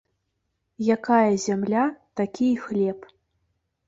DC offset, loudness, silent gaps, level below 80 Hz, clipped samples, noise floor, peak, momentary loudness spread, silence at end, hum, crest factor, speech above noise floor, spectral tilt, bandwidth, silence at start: under 0.1%; -24 LUFS; none; -66 dBFS; under 0.1%; -76 dBFS; -6 dBFS; 9 LU; 0.85 s; none; 18 dB; 54 dB; -6 dB/octave; 8 kHz; 0.8 s